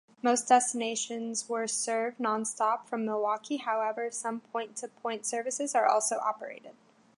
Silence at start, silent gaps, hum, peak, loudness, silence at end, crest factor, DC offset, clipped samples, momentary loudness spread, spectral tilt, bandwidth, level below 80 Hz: 0.25 s; none; none; -8 dBFS; -30 LUFS; 0.45 s; 22 dB; under 0.1%; under 0.1%; 11 LU; -2 dB/octave; 11.5 kHz; -88 dBFS